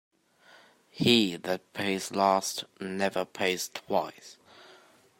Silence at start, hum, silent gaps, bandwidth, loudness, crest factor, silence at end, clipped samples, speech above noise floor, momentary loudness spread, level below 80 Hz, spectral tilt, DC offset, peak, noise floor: 0.95 s; none; none; 16.5 kHz; -28 LUFS; 24 dB; 0.55 s; under 0.1%; 30 dB; 12 LU; -72 dBFS; -3.5 dB/octave; under 0.1%; -6 dBFS; -59 dBFS